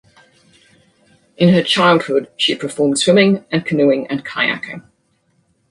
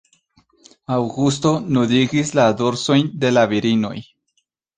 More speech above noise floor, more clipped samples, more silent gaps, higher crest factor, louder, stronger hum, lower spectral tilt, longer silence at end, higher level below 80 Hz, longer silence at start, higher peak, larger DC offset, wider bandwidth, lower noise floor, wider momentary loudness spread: second, 47 dB vs 52 dB; neither; neither; about the same, 16 dB vs 16 dB; first, -15 LUFS vs -18 LUFS; neither; about the same, -5 dB/octave vs -5.5 dB/octave; first, 0.9 s vs 0.75 s; about the same, -60 dBFS vs -56 dBFS; first, 1.4 s vs 0.9 s; about the same, 0 dBFS vs -2 dBFS; neither; first, 11.5 kHz vs 9.6 kHz; second, -62 dBFS vs -69 dBFS; first, 9 LU vs 6 LU